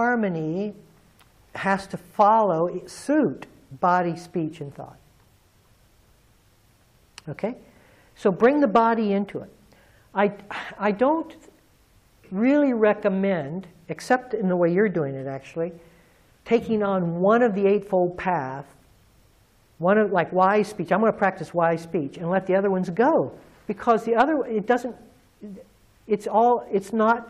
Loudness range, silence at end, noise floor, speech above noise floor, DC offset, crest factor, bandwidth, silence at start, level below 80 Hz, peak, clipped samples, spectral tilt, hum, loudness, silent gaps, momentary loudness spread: 5 LU; 0 s; -59 dBFS; 37 dB; under 0.1%; 18 dB; 13.5 kHz; 0 s; -60 dBFS; -6 dBFS; under 0.1%; -7 dB/octave; none; -23 LUFS; none; 15 LU